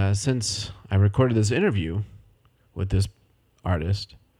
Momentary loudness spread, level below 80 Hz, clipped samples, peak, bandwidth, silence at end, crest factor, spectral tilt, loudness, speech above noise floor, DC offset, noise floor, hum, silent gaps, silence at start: 12 LU; -42 dBFS; under 0.1%; -8 dBFS; 11.5 kHz; 0.35 s; 16 dB; -5.5 dB/octave; -25 LUFS; 37 dB; under 0.1%; -60 dBFS; none; none; 0 s